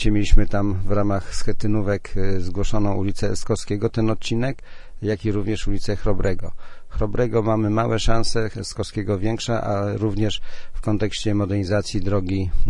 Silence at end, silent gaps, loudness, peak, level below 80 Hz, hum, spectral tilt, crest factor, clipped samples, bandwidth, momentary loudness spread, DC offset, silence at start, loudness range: 0 s; none; -24 LUFS; 0 dBFS; -26 dBFS; none; -6 dB/octave; 18 dB; under 0.1%; 10.5 kHz; 7 LU; under 0.1%; 0 s; 2 LU